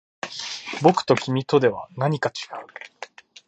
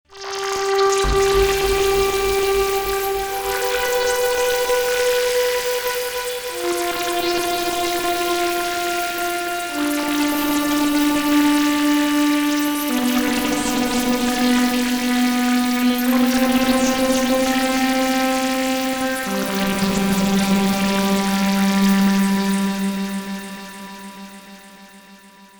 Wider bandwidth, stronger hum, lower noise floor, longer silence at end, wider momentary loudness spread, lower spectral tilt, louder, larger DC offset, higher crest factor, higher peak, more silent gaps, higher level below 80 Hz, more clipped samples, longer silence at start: second, 8.8 kHz vs over 20 kHz; neither; about the same, -43 dBFS vs -45 dBFS; first, 0.4 s vs 0.15 s; first, 20 LU vs 6 LU; first, -5.5 dB/octave vs -4 dB/octave; second, -22 LUFS vs -19 LUFS; neither; first, 22 dB vs 14 dB; first, -2 dBFS vs -6 dBFS; neither; second, -66 dBFS vs -40 dBFS; neither; first, 0.25 s vs 0.1 s